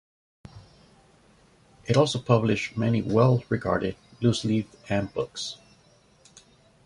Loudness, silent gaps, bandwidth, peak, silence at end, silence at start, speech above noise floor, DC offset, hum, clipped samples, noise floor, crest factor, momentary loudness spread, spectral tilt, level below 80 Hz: -25 LUFS; none; 11.5 kHz; -4 dBFS; 1.3 s; 0.55 s; 35 dB; under 0.1%; none; under 0.1%; -59 dBFS; 22 dB; 12 LU; -6.5 dB/octave; -54 dBFS